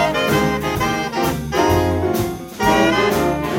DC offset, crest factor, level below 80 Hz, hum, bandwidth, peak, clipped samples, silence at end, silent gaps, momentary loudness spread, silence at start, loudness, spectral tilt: under 0.1%; 16 dB; -36 dBFS; none; 16.5 kHz; -2 dBFS; under 0.1%; 0 s; none; 5 LU; 0 s; -18 LUFS; -5 dB/octave